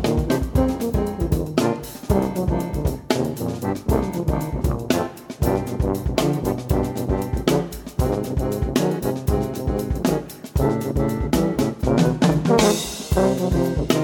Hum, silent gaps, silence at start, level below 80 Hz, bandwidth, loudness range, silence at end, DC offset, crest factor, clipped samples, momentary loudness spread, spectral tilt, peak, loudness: none; none; 0 s; -30 dBFS; 19 kHz; 4 LU; 0 s; under 0.1%; 20 dB; under 0.1%; 6 LU; -6 dB/octave; -2 dBFS; -22 LUFS